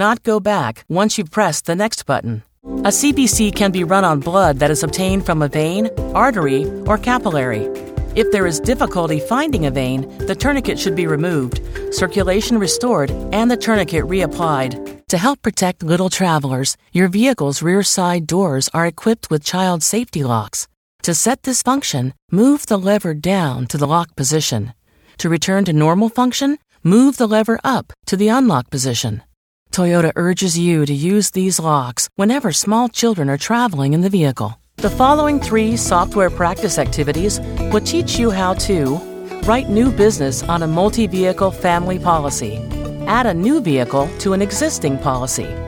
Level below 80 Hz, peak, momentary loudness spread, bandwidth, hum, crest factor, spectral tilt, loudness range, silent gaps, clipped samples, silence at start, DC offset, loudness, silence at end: -34 dBFS; 0 dBFS; 7 LU; 18 kHz; none; 16 dB; -4.5 dB/octave; 2 LU; 20.77-20.99 s, 22.22-22.28 s, 29.37-29.66 s; under 0.1%; 0 s; under 0.1%; -16 LUFS; 0 s